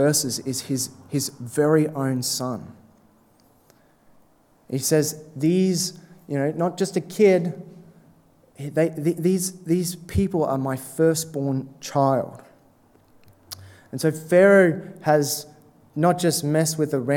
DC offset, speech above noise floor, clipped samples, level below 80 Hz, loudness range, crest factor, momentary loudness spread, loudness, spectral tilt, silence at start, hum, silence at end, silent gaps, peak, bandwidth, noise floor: under 0.1%; 36 dB; under 0.1%; -52 dBFS; 6 LU; 20 dB; 12 LU; -22 LUFS; -5 dB/octave; 0 s; none; 0 s; none; -4 dBFS; 18.5 kHz; -58 dBFS